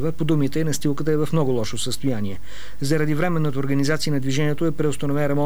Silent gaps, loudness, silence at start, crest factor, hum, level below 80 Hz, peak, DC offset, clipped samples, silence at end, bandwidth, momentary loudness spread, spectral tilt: none; -23 LUFS; 0 s; 14 dB; none; -46 dBFS; -6 dBFS; 7%; under 0.1%; 0 s; 19.5 kHz; 5 LU; -6 dB/octave